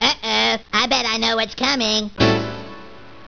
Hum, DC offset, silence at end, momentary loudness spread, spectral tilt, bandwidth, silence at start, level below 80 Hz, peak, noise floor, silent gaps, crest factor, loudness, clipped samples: none; under 0.1%; 0.05 s; 9 LU; -3 dB/octave; 5.4 kHz; 0 s; -44 dBFS; -2 dBFS; -41 dBFS; none; 18 dB; -17 LUFS; under 0.1%